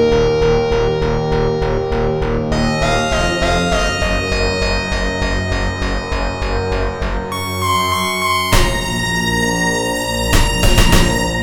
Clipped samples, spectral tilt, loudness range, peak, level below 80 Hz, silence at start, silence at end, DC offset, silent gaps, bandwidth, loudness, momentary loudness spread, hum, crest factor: under 0.1%; -4.5 dB/octave; 4 LU; 0 dBFS; -22 dBFS; 0 s; 0 s; 0.5%; none; 19.5 kHz; -16 LUFS; 6 LU; none; 16 dB